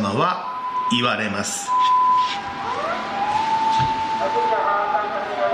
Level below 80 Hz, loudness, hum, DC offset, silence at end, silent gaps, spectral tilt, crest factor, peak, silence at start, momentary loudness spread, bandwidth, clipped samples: -52 dBFS; -21 LUFS; none; under 0.1%; 0 s; none; -3.5 dB/octave; 16 dB; -4 dBFS; 0 s; 8 LU; 14.5 kHz; under 0.1%